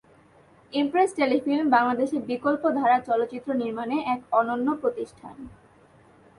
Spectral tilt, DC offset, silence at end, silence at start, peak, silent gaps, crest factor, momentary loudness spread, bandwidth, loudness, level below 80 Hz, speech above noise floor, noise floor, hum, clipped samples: -5.5 dB/octave; under 0.1%; 0.85 s; 0.7 s; -6 dBFS; none; 18 dB; 15 LU; 11.5 kHz; -24 LUFS; -64 dBFS; 31 dB; -56 dBFS; none; under 0.1%